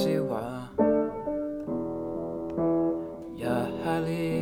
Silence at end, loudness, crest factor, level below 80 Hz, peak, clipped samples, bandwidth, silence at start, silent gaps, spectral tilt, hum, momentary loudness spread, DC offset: 0 s; -30 LUFS; 16 dB; -54 dBFS; -12 dBFS; under 0.1%; 17 kHz; 0 s; none; -7.5 dB/octave; none; 8 LU; under 0.1%